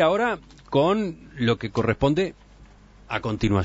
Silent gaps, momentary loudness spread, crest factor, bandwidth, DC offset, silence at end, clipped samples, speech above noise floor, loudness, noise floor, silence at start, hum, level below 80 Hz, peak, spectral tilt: none; 9 LU; 16 dB; 8 kHz; under 0.1%; 0 s; under 0.1%; 27 dB; -24 LUFS; -49 dBFS; 0 s; none; -44 dBFS; -8 dBFS; -7 dB/octave